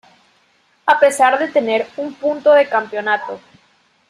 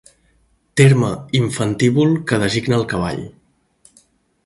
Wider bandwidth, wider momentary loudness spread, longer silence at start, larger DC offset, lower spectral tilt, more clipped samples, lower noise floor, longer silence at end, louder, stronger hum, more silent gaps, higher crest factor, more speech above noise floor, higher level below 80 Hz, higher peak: first, 13 kHz vs 11.5 kHz; about the same, 11 LU vs 12 LU; about the same, 0.85 s vs 0.75 s; neither; second, -3 dB/octave vs -6 dB/octave; neither; about the same, -58 dBFS vs -59 dBFS; second, 0.7 s vs 1.15 s; about the same, -16 LUFS vs -17 LUFS; neither; neither; about the same, 16 dB vs 18 dB; about the same, 43 dB vs 44 dB; second, -70 dBFS vs -46 dBFS; about the same, -2 dBFS vs 0 dBFS